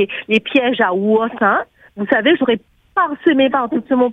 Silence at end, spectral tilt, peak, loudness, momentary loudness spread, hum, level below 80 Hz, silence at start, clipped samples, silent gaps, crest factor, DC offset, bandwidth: 0 s; -7 dB/octave; 0 dBFS; -16 LUFS; 7 LU; none; -60 dBFS; 0 s; under 0.1%; none; 16 dB; under 0.1%; 6.2 kHz